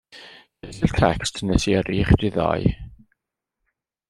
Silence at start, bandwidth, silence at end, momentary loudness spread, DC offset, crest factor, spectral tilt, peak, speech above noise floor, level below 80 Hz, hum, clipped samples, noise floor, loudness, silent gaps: 0.15 s; 12 kHz; 1.2 s; 22 LU; under 0.1%; 20 dB; -6 dB/octave; -2 dBFS; 62 dB; -34 dBFS; none; under 0.1%; -82 dBFS; -21 LUFS; none